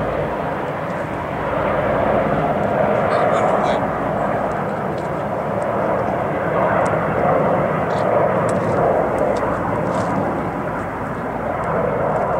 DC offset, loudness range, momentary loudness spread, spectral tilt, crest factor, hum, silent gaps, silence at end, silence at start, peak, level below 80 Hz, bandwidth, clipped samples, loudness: under 0.1%; 2 LU; 7 LU; -7.5 dB/octave; 14 dB; none; none; 0 s; 0 s; -6 dBFS; -40 dBFS; 16 kHz; under 0.1%; -19 LUFS